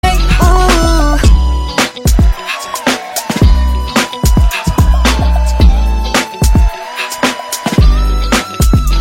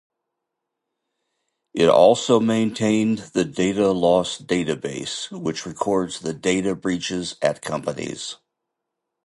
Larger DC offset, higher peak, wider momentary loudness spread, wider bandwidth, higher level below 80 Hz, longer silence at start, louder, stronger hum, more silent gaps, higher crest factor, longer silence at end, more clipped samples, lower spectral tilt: neither; about the same, 0 dBFS vs -2 dBFS; second, 5 LU vs 12 LU; first, 16.5 kHz vs 11.5 kHz; first, -12 dBFS vs -56 dBFS; second, 0.05 s vs 1.75 s; first, -12 LUFS vs -21 LUFS; neither; neither; second, 10 dB vs 20 dB; second, 0 s vs 0.9 s; neither; about the same, -5 dB/octave vs -5 dB/octave